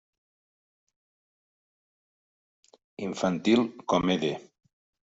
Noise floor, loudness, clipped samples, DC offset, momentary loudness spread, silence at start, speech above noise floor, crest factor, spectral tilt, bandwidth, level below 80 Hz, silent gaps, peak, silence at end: under -90 dBFS; -27 LUFS; under 0.1%; under 0.1%; 13 LU; 3 s; over 64 dB; 22 dB; -5.5 dB/octave; 8 kHz; -64 dBFS; none; -10 dBFS; 0.75 s